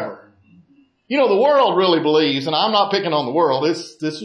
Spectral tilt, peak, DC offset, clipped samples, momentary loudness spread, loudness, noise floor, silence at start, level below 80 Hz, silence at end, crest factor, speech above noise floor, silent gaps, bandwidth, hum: -5.5 dB/octave; -4 dBFS; under 0.1%; under 0.1%; 9 LU; -17 LUFS; -54 dBFS; 0 s; -72 dBFS; 0 s; 14 dB; 37 dB; none; 10.5 kHz; none